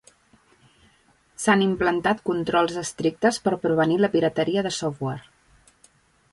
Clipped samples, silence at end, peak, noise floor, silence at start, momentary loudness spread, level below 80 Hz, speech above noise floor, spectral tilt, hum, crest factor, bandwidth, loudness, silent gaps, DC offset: under 0.1%; 1.1 s; -6 dBFS; -61 dBFS; 1.4 s; 7 LU; -58 dBFS; 38 dB; -5 dB/octave; none; 18 dB; 11.5 kHz; -23 LUFS; none; under 0.1%